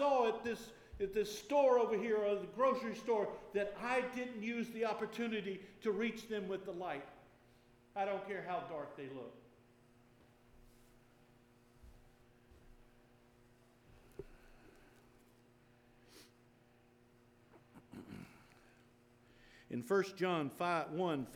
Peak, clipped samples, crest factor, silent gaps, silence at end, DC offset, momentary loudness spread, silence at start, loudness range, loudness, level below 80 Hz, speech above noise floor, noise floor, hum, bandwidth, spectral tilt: -20 dBFS; under 0.1%; 20 dB; none; 0 s; under 0.1%; 21 LU; 0 s; 26 LU; -38 LUFS; -70 dBFS; 30 dB; -68 dBFS; none; 18.5 kHz; -5.5 dB/octave